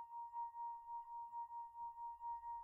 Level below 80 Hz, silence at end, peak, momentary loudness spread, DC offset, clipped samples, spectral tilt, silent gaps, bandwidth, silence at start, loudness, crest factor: -82 dBFS; 0 s; -40 dBFS; 3 LU; under 0.1%; under 0.1%; -3.5 dB/octave; none; 2.9 kHz; 0 s; -50 LUFS; 10 dB